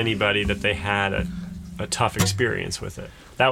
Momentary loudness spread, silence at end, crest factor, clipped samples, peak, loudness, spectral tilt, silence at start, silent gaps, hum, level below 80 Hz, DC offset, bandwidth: 14 LU; 0 s; 18 dB; under 0.1%; -6 dBFS; -23 LUFS; -4 dB/octave; 0 s; none; none; -40 dBFS; under 0.1%; 17.5 kHz